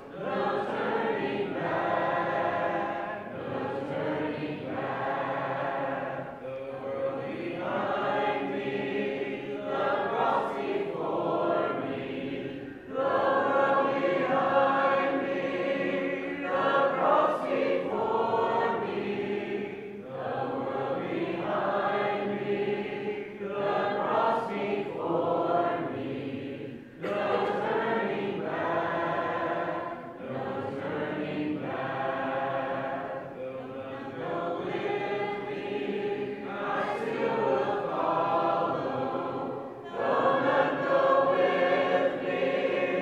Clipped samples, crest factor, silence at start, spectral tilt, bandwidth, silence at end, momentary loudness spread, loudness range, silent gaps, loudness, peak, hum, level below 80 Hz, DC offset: under 0.1%; 18 dB; 0 s; -7 dB/octave; 8 kHz; 0 s; 10 LU; 6 LU; none; -29 LUFS; -12 dBFS; none; -68 dBFS; under 0.1%